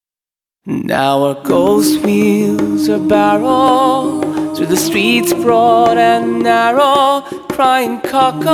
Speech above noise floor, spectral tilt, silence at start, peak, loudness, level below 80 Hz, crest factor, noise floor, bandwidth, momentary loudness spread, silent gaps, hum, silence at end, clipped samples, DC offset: over 78 dB; -4.5 dB/octave; 0.65 s; 0 dBFS; -12 LUFS; -50 dBFS; 12 dB; under -90 dBFS; 19 kHz; 7 LU; none; none; 0 s; under 0.1%; under 0.1%